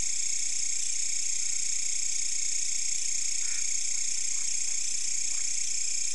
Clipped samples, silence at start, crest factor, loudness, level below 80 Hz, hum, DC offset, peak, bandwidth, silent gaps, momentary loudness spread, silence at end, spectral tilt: under 0.1%; 0 s; 14 dB; -28 LUFS; -68 dBFS; none; 4%; -16 dBFS; 12 kHz; none; 0 LU; 0 s; 2.5 dB/octave